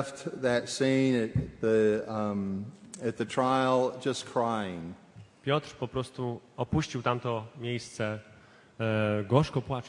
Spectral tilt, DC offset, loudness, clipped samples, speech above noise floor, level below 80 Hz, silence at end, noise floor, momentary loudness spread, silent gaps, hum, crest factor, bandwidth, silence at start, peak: -6 dB/octave; under 0.1%; -30 LUFS; under 0.1%; 27 dB; -58 dBFS; 0 s; -56 dBFS; 11 LU; none; none; 22 dB; 11.5 kHz; 0 s; -8 dBFS